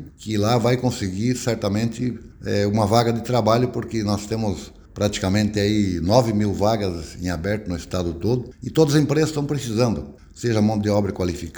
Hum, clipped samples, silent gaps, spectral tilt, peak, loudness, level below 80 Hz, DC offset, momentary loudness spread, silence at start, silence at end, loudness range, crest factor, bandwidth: none; under 0.1%; none; -6 dB/octave; -2 dBFS; -22 LUFS; -44 dBFS; under 0.1%; 9 LU; 0 s; 0 s; 1 LU; 20 dB; over 20 kHz